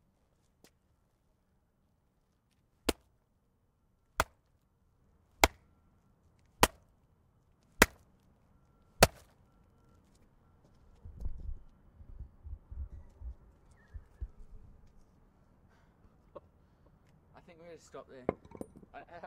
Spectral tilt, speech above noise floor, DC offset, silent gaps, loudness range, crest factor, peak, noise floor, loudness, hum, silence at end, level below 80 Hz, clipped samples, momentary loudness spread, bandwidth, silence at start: -3 dB/octave; 30 dB; under 0.1%; none; 22 LU; 34 dB; -6 dBFS; -74 dBFS; -32 LUFS; none; 0 s; -50 dBFS; under 0.1%; 28 LU; 15.5 kHz; 2.85 s